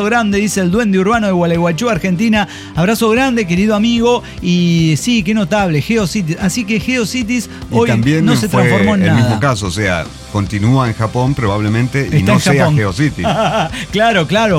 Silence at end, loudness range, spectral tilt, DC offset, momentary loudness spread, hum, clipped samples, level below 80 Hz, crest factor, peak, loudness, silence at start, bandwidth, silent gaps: 0 s; 1 LU; -5.5 dB/octave; under 0.1%; 5 LU; none; under 0.1%; -36 dBFS; 12 dB; -2 dBFS; -13 LUFS; 0 s; 16 kHz; none